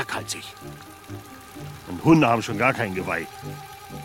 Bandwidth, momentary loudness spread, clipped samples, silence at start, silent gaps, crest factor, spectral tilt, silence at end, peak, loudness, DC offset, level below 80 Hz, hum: 17 kHz; 22 LU; under 0.1%; 0 s; none; 20 dB; -5.5 dB/octave; 0 s; -6 dBFS; -22 LUFS; under 0.1%; -54 dBFS; none